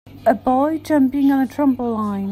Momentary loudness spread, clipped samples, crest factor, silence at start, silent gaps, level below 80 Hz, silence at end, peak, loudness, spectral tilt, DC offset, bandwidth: 5 LU; under 0.1%; 16 dB; 0.05 s; none; -50 dBFS; 0 s; -2 dBFS; -18 LUFS; -7.5 dB/octave; under 0.1%; 15 kHz